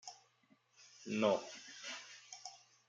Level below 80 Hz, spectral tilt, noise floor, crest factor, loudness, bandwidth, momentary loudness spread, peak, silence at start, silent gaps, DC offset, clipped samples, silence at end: under -90 dBFS; -4 dB/octave; -73 dBFS; 24 dB; -41 LUFS; 9.2 kHz; 20 LU; -20 dBFS; 0.05 s; none; under 0.1%; under 0.1%; 0.3 s